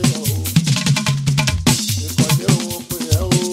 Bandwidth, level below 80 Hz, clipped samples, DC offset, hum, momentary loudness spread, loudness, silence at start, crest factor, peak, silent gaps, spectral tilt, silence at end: 16.5 kHz; -36 dBFS; under 0.1%; under 0.1%; none; 4 LU; -17 LUFS; 0 s; 16 dB; -2 dBFS; none; -4.5 dB/octave; 0 s